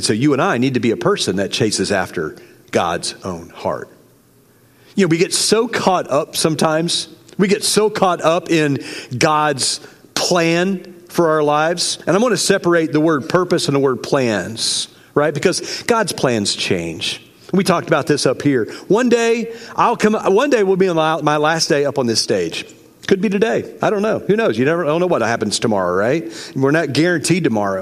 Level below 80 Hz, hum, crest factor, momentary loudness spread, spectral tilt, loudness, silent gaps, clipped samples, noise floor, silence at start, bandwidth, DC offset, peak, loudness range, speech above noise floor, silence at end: -58 dBFS; none; 16 dB; 8 LU; -4 dB/octave; -17 LUFS; none; under 0.1%; -51 dBFS; 0 s; 15.5 kHz; under 0.1%; 0 dBFS; 3 LU; 35 dB; 0 s